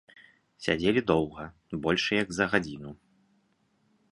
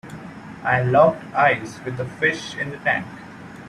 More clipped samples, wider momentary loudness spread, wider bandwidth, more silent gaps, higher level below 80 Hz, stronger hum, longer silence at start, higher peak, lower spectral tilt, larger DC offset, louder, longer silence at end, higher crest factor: neither; second, 16 LU vs 21 LU; about the same, 11.5 kHz vs 12 kHz; neither; about the same, -56 dBFS vs -56 dBFS; neither; first, 0.6 s vs 0.05 s; second, -6 dBFS vs -2 dBFS; about the same, -5 dB/octave vs -6 dB/octave; neither; second, -28 LUFS vs -21 LUFS; first, 1.2 s vs 0 s; about the same, 24 dB vs 20 dB